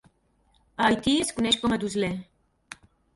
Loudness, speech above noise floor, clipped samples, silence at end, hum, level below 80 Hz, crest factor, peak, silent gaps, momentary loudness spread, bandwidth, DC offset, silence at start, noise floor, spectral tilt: -25 LUFS; 41 dB; under 0.1%; 0.4 s; none; -54 dBFS; 20 dB; -8 dBFS; none; 23 LU; 11.5 kHz; under 0.1%; 0.8 s; -66 dBFS; -3.5 dB/octave